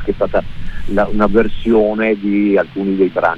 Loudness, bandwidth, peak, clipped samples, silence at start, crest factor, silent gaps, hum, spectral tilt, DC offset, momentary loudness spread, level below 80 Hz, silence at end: -15 LUFS; 5.2 kHz; -2 dBFS; under 0.1%; 0 s; 12 dB; none; none; -8.5 dB/octave; under 0.1%; 7 LU; -28 dBFS; 0 s